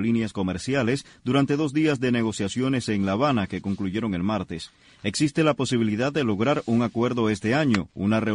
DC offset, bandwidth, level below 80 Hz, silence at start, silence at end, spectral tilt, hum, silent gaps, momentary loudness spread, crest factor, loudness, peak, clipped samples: under 0.1%; 10.5 kHz; -54 dBFS; 0 s; 0 s; -6 dB/octave; none; none; 6 LU; 18 dB; -24 LUFS; -6 dBFS; under 0.1%